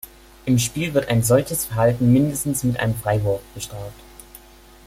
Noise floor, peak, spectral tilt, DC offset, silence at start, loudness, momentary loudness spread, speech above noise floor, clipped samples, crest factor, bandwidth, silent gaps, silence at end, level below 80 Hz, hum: -47 dBFS; -4 dBFS; -5.5 dB/octave; under 0.1%; 0.05 s; -20 LUFS; 15 LU; 27 dB; under 0.1%; 18 dB; 16.5 kHz; none; 0.5 s; -44 dBFS; none